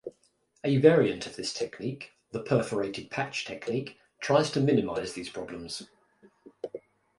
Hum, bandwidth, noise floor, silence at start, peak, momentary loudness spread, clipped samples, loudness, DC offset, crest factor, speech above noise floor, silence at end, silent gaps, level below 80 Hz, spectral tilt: none; 11.5 kHz; -69 dBFS; 0.05 s; -6 dBFS; 19 LU; under 0.1%; -29 LUFS; under 0.1%; 24 dB; 41 dB; 0.4 s; none; -64 dBFS; -5.5 dB/octave